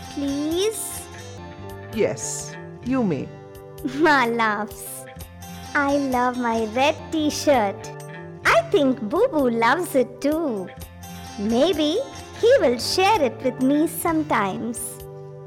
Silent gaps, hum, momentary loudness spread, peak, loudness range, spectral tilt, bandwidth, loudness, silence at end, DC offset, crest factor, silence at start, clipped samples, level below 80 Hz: none; none; 19 LU; -10 dBFS; 4 LU; -4 dB/octave; 18 kHz; -22 LUFS; 0 s; under 0.1%; 14 dB; 0 s; under 0.1%; -50 dBFS